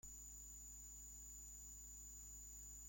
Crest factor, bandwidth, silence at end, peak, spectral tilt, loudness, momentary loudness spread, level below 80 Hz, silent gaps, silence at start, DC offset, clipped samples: 12 dB; 16.5 kHz; 0 s; -46 dBFS; -2 dB/octave; -55 LUFS; 0 LU; -62 dBFS; none; 0.05 s; under 0.1%; under 0.1%